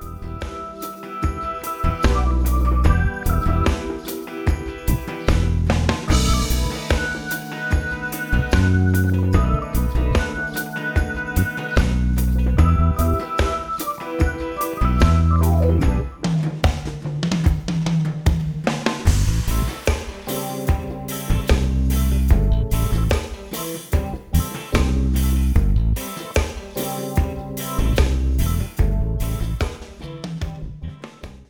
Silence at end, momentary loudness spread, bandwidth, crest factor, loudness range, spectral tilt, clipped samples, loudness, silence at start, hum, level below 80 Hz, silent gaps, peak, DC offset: 0.05 s; 10 LU; over 20 kHz; 18 dB; 3 LU; -6 dB/octave; under 0.1%; -21 LUFS; 0 s; none; -22 dBFS; none; -2 dBFS; under 0.1%